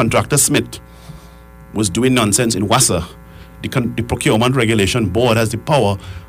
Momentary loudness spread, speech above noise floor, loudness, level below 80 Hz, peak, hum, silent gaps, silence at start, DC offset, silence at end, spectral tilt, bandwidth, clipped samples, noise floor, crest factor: 9 LU; 24 dB; -15 LUFS; -38 dBFS; -2 dBFS; none; none; 0 s; under 0.1%; 0.05 s; -4 dB/octave; 16 kHz; under 0.1%; -39 dBFS; 14 dB